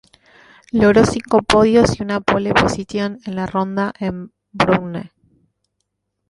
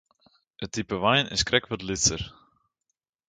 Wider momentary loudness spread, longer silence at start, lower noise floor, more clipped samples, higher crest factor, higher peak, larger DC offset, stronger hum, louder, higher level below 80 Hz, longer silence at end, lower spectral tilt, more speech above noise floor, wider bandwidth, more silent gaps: about the same, 13 LU vs 14 LU; first, 0.75 s vs 0.6 s; second, -74 dBFS vs -82 dBFS; neither; second, 16 dB vs 24 dB; about the same, -2 dBFS vs -4 dBFS; neither; first, 50 Hz at -40 dBFS vs none; first, -17 LUFS vs -25 LUFS; first, -40 dBFS vs -50 dBFS; first, 1.25 s vs 1 s; first, -5.5 dB/octave vs -2.5 dB/octave; about the same, 57 dB vs 56 dB; about the same, 11.5 kHz vs 11 kHz; neither